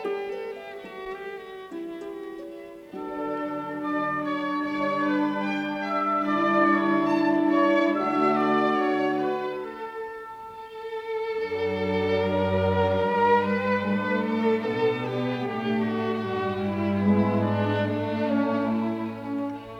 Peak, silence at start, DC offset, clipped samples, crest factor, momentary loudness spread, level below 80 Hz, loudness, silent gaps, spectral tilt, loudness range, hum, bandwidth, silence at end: -10 dBFS; 0 s; under 0.1%; under 0.1%; 16 dB; 15 LU; -64 dBFS; -25 LUFS; none; -7.5 dB/octave; 8 LU; none; 10 kHz; 0 s